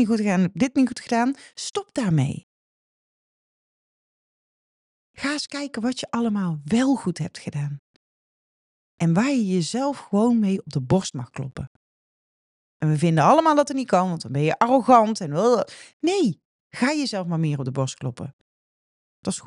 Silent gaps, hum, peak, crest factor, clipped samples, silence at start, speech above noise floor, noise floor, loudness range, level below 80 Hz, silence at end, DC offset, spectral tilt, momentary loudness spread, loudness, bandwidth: 2.43-5.14 s, 7.79-8.98 s, 11.67-12.80 s, 15.93-16.00 s, 16.45-16.70 s, 18.33-19.23 s; none; -2 dBFS; 20 dB; under 0.1%; 0 s; over 68 dB; under -90 dBFS; 10 LU; -60 dBFS; 0.05 s; under 0.1%; -6 dB/octave; 15 LU; -22 LUFS; 11.5 kHz